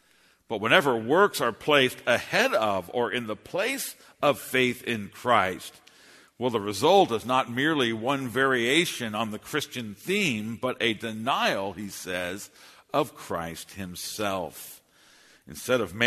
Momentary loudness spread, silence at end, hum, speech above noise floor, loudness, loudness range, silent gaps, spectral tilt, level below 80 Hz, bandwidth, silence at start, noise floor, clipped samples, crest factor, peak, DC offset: 14 LU; 0 s; none; 36 dB; -26 LUFS; 8 LU; none; -4 dB/octave; -64 dBFS; 13.5 kHz; 0.5 s; -62 dBFS; under 0.1%; 24 dB; -4 dBFS; under 0.1%